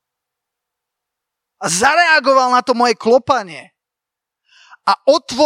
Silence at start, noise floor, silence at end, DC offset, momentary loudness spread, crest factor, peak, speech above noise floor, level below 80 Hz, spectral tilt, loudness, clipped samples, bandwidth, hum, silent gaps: 1.6 s; -84 dBFS; 0 s; under 0.1%; 12 LU; 16 dB; 0 dBFS; 70 dB; -60 dBFS; -2.5 dB/octave; -14 LUFS; under 0.1%; 16 kHz; none; none